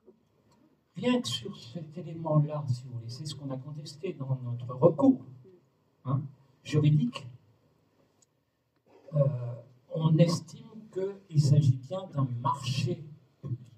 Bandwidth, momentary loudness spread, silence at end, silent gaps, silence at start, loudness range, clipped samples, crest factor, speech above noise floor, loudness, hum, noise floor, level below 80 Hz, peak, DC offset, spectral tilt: 10.5 kHz; 18 LU; 0.15 s; none; 0.95 s; 5 LU; under 0.1%; 22 dB; 46 dB; -30 LUFS; none; -75 dBFS; -72 dBFS; -8 dBFS; under 0.1%; -7.5 dB/octave